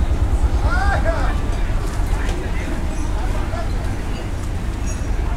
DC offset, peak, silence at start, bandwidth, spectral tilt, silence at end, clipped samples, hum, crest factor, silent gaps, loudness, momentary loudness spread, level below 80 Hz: under 0.1%; -4 dBFS; 0 s; 13.5 kHz; -6 dB/octave; 0 s; under 0.1%; none; 14 dB; none; -23 LUFS; 7 LU; -20 dBFS